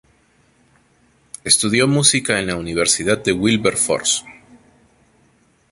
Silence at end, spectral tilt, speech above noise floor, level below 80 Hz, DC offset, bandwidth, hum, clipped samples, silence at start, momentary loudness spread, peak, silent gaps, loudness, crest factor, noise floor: 1.4 s; -3 dB/octave; 40 dB; -50 dBFS; under 0.1%; 12 kHz; none; under 0.1%; 1.45 s; 8 LU; 0 dBFS; none; -16 LUFS; 20 dB; -57 dBFS